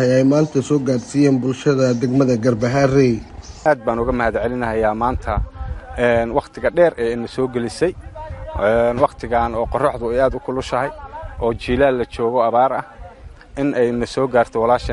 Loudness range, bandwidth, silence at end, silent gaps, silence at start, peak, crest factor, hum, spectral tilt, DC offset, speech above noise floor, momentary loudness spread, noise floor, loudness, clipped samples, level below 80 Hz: 3 LU; 11.5 kHz; 0 s; none; 0 s; -2 dBFS; 16 dB; none; -7 dB/octave; under 0.1%; 22 dB; 10 LU; -39 dBFS; -18 LUFS; under 0.1%; -34 dBFS